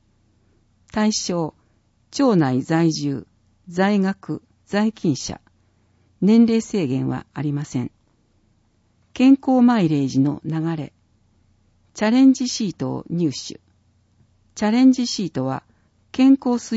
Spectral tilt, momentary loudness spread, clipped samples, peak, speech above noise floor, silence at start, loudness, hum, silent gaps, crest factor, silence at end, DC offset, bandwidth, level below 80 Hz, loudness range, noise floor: -6 dB/octave; 16 LU; under 0.1%; -4 dBFS; 43 dB; 0.95 s; -20 LUFS; none; none; 16 dB; 0 s; under 0.1%; 8 kHz; -58 dBFS; 2 LU; -62 dBFS